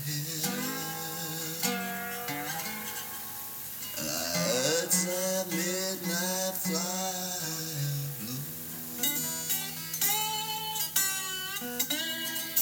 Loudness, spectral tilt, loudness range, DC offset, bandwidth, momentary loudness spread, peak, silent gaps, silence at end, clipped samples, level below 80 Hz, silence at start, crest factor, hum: -30 LUFS; -2.5 dB/octave; 4 LU; under 0.1%; over 20 kHz; 9 LU; -12 dBFS; none; 0 s; under 0.1%; -68 dBFS; 0 s; 20 dB; none